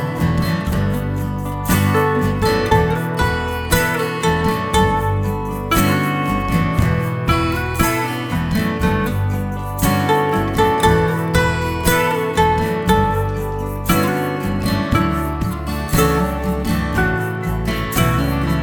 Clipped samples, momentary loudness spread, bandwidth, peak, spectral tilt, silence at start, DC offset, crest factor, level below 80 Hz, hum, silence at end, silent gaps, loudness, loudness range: under 0.1%; 6 LU; over 20 kHz; 0 dBFS; -5.5 dB/octave; 0 s; under 0.1%; 16 dB; -28 dBFS; none; 0 s; none; -18 LUFS; 2 LU